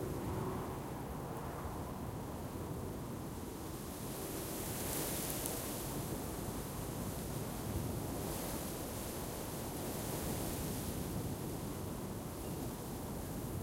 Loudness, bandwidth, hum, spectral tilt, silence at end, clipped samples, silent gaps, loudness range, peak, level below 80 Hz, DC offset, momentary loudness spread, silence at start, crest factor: -42 LUFS; 17 kHz; none; -5 dB/octave; 0 s; under 0.1%; none; 3 LU; -18 dBFS; -52 dBFS; under 0.1%; 5 LU; 0 s; 24 dB